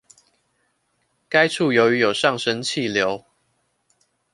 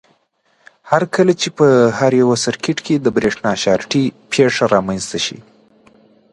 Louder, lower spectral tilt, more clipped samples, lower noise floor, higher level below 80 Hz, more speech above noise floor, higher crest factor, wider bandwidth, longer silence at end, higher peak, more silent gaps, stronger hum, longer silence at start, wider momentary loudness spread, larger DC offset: second, -19 LUFS vs -15 LUFS; about the same, -4 dB/octave vs -5 dB/octave; neither; first, -69 dBFS vs -60 dBFS; second, -64 dBFS vs -54 dBFS; first, 50 dB vs 45 dB; first, 22 dB vs 16 dB; about the same, 11.5 kHz vs 11.5 kHz; first, 1.15 s vs 0.9 s; about the same, -2 dBFS vs 0 dBFS; neither; neither; first, 1.3 s vs 0.85 s; about the same, 6 LU vs 8 LU; neither